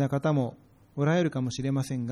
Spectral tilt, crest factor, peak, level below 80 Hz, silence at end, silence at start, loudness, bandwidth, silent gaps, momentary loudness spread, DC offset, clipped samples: -7 dB/octave; 14 dB; -14 dBFS; -62 dBFS; 0 s; 0 s; -28 LUFS; 13 kHz; none; 7 LU; under 0.1%; under 0.1%